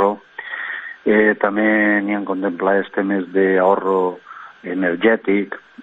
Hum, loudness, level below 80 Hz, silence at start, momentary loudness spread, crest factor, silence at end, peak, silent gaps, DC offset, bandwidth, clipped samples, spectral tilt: none; -18 LUFS; -62 dBFS; 0 s; 14 LU; 16 dB; 0 s; -2 dBFS; none; under 0.1%; 4 kHz; under 0.1%; -9 dB/octave